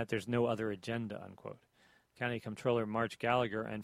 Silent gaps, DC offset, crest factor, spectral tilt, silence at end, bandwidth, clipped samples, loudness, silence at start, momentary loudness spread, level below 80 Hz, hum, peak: none; under 0.1%; 20 dB; -6.5 dB/octave; 0 s; 14.5 kHz; under 0.1%; -36 LUFS; 0 s; 14 LU; -70 dBFS; none; -18 dBFS